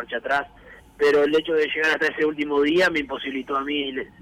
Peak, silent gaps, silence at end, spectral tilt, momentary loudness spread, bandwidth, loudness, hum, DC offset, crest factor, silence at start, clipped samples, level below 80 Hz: -12 dBFS; none; 0.15 s; -4 dB/octave; 8 LU; 13.5 kHz; -22 LUFS; none; under 0.1%; 10 dB; 0 s; under 0.1%; -56 dBFS